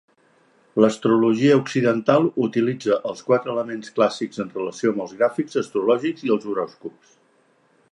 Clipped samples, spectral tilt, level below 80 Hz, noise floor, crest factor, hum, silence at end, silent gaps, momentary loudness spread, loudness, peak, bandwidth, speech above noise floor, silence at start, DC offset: under 0.1%; -6.5 dB/octave; -70 dBFS; -61 dBFS; 20 dB; none; 1 s; none; 11 LU; -21 LUFS; -2 dBFS; 11 kHz; 40 dB; 0.75 s; under 0.1%